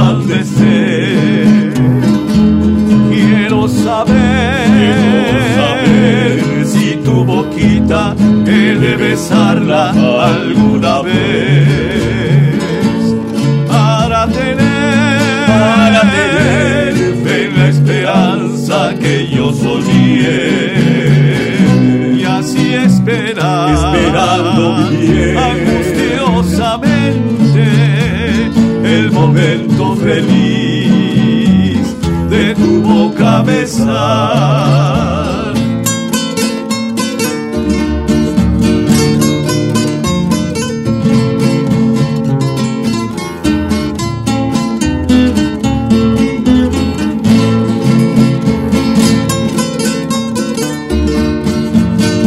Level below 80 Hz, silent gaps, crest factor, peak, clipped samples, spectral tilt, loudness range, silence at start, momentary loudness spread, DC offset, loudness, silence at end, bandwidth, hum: -28 dBFS; none; 10 dB; 0 dBFS; under 0.1%; -6 dB/octave; 3 LU; 0 s; 5 LU; under 0.1%; -11 LUFS; 0 s; 15 kHz; none